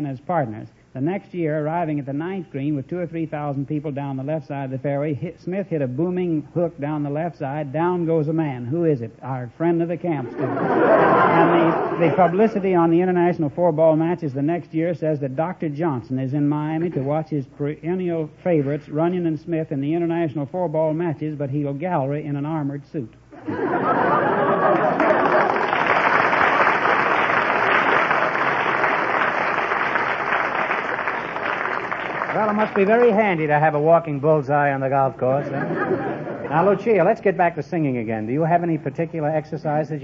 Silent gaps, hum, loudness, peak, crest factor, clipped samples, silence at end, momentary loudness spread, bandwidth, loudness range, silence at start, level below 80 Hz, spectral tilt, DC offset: none; none; -21 LUFS; -4 dBFS; 18 dB; under 0.1%; 0 s; 10 LU; 7 kHz; 8 LU; 0 s; -58 dBFS; -8.5 dB/octave; under 0.1%